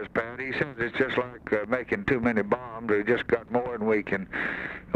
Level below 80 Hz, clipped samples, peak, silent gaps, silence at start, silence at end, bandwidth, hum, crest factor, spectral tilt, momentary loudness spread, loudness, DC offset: -54 dBFS; under 0.1%; -8 dBFS; none; 0 s; 0 s; 8.6 kHz; none; 20 dB; -7.5 dB/octave; 5 LU; -28 LUFS; under 0.1%